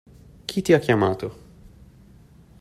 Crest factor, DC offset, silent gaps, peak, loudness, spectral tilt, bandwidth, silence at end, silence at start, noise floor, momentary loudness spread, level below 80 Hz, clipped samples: 22 dB; under 0.1%; none; -4 dBFS; -21 LUFS; -6 dB/octave; 15 kHz; 1.25 s; 0.5 s; -50 dBFS; 17 LU; -52 dBFS; under 0.1%